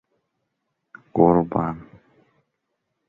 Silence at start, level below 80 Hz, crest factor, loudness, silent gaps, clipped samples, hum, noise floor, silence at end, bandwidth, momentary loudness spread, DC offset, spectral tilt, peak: 1.15 s; -52 dBFS; 22 dB; -21 LUFS; none; under 0.1%; none; -77 dBFS; 1.25 s; 3.1 kHz; 14 LU; under 0.1%; -12 dB/octave; -2 dBFS